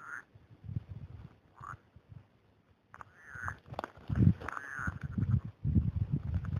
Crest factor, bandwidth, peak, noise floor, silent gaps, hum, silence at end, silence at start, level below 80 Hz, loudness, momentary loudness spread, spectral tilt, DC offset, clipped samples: 24 dB; 10 kHz; -12 dBFS; -68 dBFS; none; none; 0 s; 0 s; -46 dBFS; -35 LUFS; 25 LU; -8.5 dB/octave; under 0.1%; under 0.1%